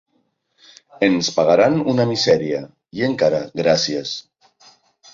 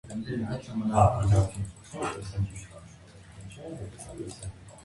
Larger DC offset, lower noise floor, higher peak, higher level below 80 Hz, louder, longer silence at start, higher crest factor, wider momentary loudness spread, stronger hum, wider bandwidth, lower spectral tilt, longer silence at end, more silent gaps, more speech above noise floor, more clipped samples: neither; first, -67 dBFS vs -50 dBFS; first, -2 dBFS vs -8 dBFS; second, -58 dBFS vs -44 dBFS; first, -18 LUFS vs -29 LUFS; first, 1 s vs 0.05 s; about the same, 18 dB vs 22 dB; second, 12 LU vs 24 LU; neither; second, 7.6 kHz vs 11.5 kHz; second, -4.5 dB/octave vs -7 dB/octave; first, 0.95 s vs 0 s; neither; first, 49 dB vs 22 dB; neither